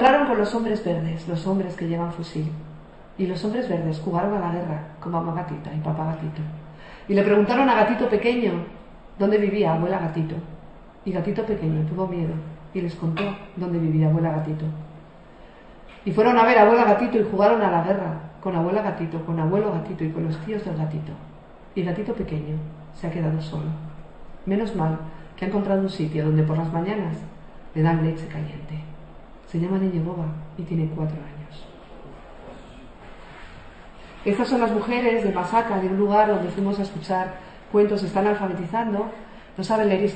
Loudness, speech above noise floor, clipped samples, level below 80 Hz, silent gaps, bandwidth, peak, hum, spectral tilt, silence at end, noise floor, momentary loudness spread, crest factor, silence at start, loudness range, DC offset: -23 LUFS; 23 dB; under 0.1%; -48 dBFS; none; 8.6 kHz; -2 dBFS; none; -8 dB/octave; 0 s; -45 dBFS; 19 LU; 22 dB; 0 s; 9 LU; under 0.1%